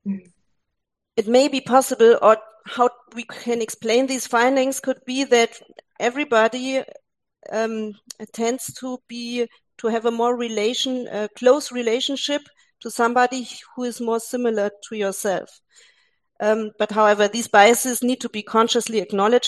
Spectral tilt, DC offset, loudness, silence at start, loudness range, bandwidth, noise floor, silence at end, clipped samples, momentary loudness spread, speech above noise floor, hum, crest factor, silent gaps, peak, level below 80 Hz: -3 dB/octave; under 0.1%; -20 LUFS; 0.05 s; 6 LU; 12.5 kHz; -79 dBFS; 0 s; under 0.1%; 14 LU; 59 dB; none; 20 dB; none; 0 dBFS; -72 dBFS